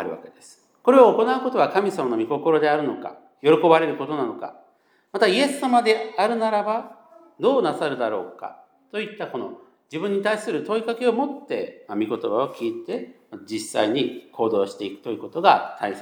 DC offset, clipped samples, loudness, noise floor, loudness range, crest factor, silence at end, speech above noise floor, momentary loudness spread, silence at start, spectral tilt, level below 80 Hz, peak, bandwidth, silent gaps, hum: under 0.1%; under 0.1%; -22 LUFS; -61 dBFS; 6 LU; 20 dB; 0 s; 39 dB; 15 LU; 0 s; -5 dB/octave; -84 dBFS; -2 dBFS; 16 kHz; none; none